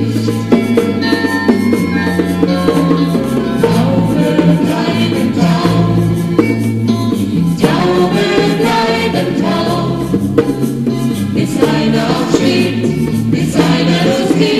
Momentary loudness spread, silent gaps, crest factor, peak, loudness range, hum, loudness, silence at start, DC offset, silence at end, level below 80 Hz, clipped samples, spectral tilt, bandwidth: 4 LU; none; 12 dB; 0 dBFS; 1 LU; none; -13 LUFS; 0 s; 0.3%; 0 s; -38 dBFS; under 0.1%; -6.5 dB/octave; 15 kHz